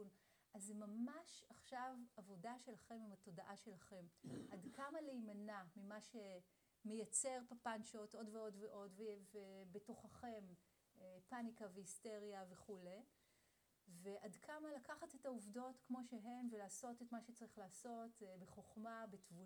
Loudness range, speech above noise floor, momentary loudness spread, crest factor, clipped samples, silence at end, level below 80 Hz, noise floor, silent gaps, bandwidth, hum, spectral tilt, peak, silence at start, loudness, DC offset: 7 LU; 27 dB; 10 LU; 24 dB; under 0.1%; 0 s; -90 dBFS; -82 dBFS; none; over 20 kHz; none; -4 dB/octave; -30 dBFS; 0 s; -54 LUFS; under 0.1%